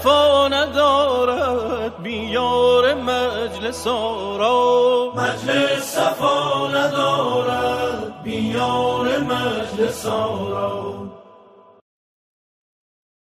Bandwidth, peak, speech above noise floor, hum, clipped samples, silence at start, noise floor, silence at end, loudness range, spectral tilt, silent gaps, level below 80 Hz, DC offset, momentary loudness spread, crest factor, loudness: 15.5 kHz; -4 dBFS; 28 dB; none; under 0.1%; 0 s; -48 dBFS; 2.15 s; 7 LU; -4 dB/octave; none; -52 dBFS; under 0.1%; 9 LU; 16 dB; -19 LUFS